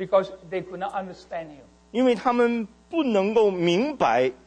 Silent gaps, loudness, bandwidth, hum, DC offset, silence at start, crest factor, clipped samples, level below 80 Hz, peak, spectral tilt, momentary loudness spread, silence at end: none; -24 LUFS; 9.4 kHz; none; under 0.1%; 0 s; 16 dB; under 0.1%; -60 dBFS; -8 dBFS; -6 dB/octave; 14 LU; 0.15 s